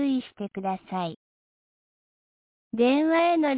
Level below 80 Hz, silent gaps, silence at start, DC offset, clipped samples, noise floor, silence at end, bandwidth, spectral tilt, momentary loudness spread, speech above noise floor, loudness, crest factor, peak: -72 dBFS; 1.16-2.71 s; 0 s; under 0.1%; under 0.1%; under -90 dBFS; 0 s; 4 kHz; -9.5 dB/octave; 14 LU; over 65 dB; -25 LUFS; 14 dB; -12 dBFS